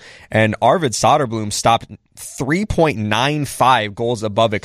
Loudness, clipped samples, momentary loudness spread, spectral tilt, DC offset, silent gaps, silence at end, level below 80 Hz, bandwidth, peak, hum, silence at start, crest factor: -17 LUFS; under 0.1%; 6 LU; -4.5 dB/octave; under 0.1%; none; 0.05 s; -42 dBFS; 15.5 kHz; -2 dBFS; none; 0.05 s; 16 dB